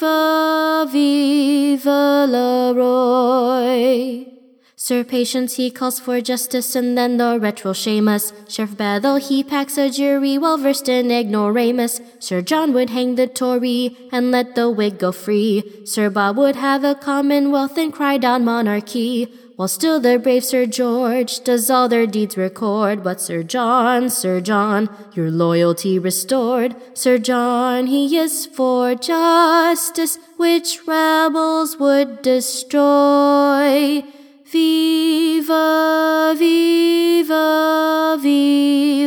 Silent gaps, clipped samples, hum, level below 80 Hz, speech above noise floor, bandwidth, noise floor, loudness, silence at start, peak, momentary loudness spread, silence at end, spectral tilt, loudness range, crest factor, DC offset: none; under 0.1%; none; -74 dBFS; 31 dB; 19.5 kHz; -47 dBFS; -17 LUFS; 0 s; -2 dBFS; 7 LU; 0 s; -4 dB/octave; 4 LU; 14 dB; under 0.1%